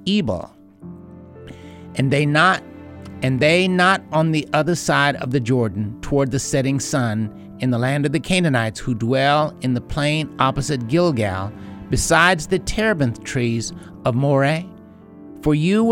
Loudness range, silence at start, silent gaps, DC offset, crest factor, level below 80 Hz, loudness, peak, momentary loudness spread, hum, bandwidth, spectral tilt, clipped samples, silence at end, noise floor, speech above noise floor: 3 LU; 0 s; none; under 0.1%; 18 dB; -40 dBFS; -19 LUFS; 0 dBFS; 15 LU; none; 16.5 kHz; -5 dB/octave; under 0.1%; 0 s; -42 dBFS; 23 dB